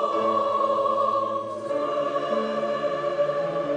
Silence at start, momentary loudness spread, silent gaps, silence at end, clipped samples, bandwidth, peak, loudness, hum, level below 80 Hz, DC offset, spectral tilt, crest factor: 0 s; 5 LU; none; 0 s; under 0.1%; 9.6 kHz; -12 dBFS; -25 LUFS; none; -66 dBFS; under 0.1%; -5.5 dB/octave; 14 dB